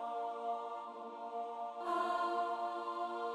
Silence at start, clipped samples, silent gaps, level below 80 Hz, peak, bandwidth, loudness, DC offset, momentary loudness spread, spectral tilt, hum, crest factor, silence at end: 0 s; under 0.1%; none; -86 dBFS; -26 dBFS; 12 kHz; -40 LUFS; under 0.1%; 9 LU; -3.5 dB/octave; none; 14 dB; 0 s